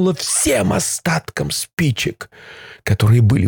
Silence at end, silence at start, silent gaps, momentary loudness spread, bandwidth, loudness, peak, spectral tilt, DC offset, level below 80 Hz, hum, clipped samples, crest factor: 0 s; 0 s; 1.73-1.77 s; 21 LU; 19.5 kHz; -17 LUFS; -2 dBFS; -4.5 dB/octave; under 0.1%; -42 dBFS; none; under 0.1%; 14 dB